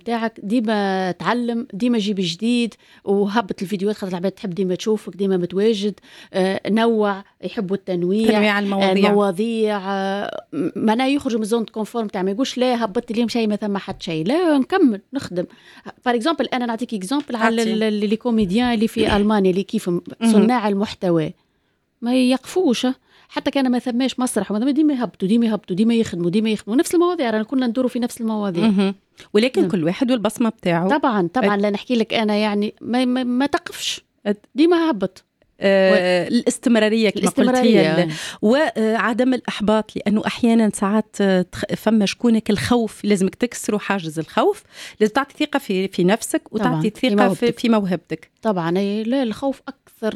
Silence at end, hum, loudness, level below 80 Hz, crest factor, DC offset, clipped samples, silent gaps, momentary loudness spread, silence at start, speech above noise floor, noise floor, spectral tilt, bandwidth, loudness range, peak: 0 s; none; -20 LUFS; -52 dBFS; 18 dB; under 0.1%; under 0.1%; none; 8 LU; 0.05 s; 48 dB; -67 dBFS; -5.5 dB/octave; 14 kHz; 4 LU; -2 dBFS